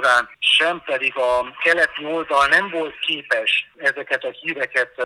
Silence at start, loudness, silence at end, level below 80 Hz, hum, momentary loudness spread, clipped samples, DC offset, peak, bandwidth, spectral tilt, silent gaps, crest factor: 0 s; -19 LUFS; 0 s; -58 dBFS; none; 9 LU; under 0.1%; under 0.1%; -2 dBFS; 13.5 kHz; -1.5 dB/octave; none; 18 dB